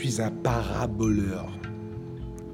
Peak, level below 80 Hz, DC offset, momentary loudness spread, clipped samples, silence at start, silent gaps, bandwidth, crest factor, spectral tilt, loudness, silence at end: -10 dBFS; -42 dBFS; under 0.1%; 12 LU; under 0.1%; 0 s; none; 16 kHz; 18 dB; -6 dB/octave; -29 LUFS; 0 s